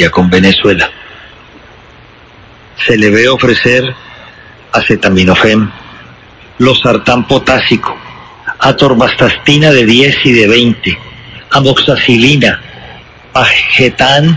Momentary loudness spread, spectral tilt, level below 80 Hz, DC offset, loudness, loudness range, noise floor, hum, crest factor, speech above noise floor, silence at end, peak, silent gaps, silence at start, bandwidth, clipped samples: 11 LU; -5 dB/octave; -34 dBFS; under 0.1%; -7 LUFS; 4 LU; -37 dBFS; none; 10 dB; 29 dB; 0 s; 0 dBFS; none; 0 s; 8 kHz; 2%